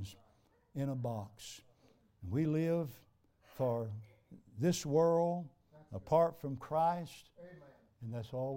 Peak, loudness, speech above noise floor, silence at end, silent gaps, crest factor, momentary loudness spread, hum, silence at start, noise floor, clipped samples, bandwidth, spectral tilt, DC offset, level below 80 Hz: -18 dBFS; -36 LUFS; 35 dB; 0 s; none; 20 dB; 22 LU; none; 0 s; -70 dBFS; under 0.1%; 16.5 kHz; -7 dB/octave; under 0.1%; -70 dBFS